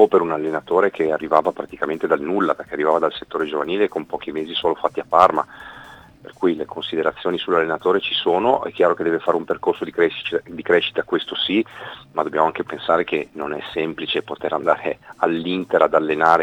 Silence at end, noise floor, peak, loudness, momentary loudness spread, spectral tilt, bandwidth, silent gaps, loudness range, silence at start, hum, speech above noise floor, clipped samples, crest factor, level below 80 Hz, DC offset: 0 s; -42 dBFS; 0 dBFS; -20 LUFS; 9 LU; -6 dB/octave; 9.6 kHz; none; 3 LU; 0 s; none; 22 dB; under 0.1%; 20 dB; -60 dBFS; under 0.1%